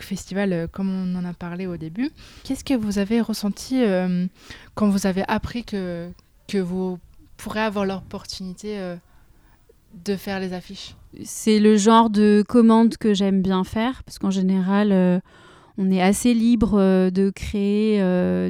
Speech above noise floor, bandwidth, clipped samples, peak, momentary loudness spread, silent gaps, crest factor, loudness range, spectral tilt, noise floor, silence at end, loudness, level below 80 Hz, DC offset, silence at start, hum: 34 dB; 15 kHz; under 0.1%; -4 dBFS; 17 LU; none; 18 dB; 11 LU; -6 dB/octave; -54 dBFS; 0 s; -21 LUFS; -46 dBFS; under 0.1%; 0 s; none